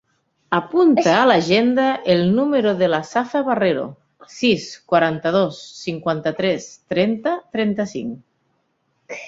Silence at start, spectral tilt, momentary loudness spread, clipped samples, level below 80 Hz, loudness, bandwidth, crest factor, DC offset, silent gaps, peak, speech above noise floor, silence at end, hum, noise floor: 0.5 s; -5.5 dB/octave; 12 LU; under 0.1%; -60 dBFS; -19 LUFS; 7.8 kHz; 18 dB; under 0.1%; none; 0 dBFS; 49 dB; 0 s; none; -68 dBFS